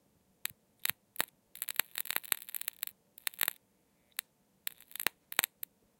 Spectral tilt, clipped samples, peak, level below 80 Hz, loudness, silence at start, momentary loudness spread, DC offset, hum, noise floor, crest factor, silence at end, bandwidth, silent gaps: 1 dB/octave; under 0.1%; -2 dBFS; -84 dBFS; -37 LUFS; 0.85 s; 10 LU; under 0.1%; none; -72 dBFS; 38 dB; 0.55 s; 17 kHz; none